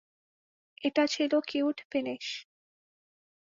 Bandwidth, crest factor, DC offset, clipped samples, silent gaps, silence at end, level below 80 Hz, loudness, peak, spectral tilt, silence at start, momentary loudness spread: 7.6 kHz; 20 dB; under 0.1%; under 0.1%; 1.85-1.90 s; 1.15 s; -80 dBFS; -30 LUFS; -14 dBFS; -3 dB/octave; 0.8 s; 10 LU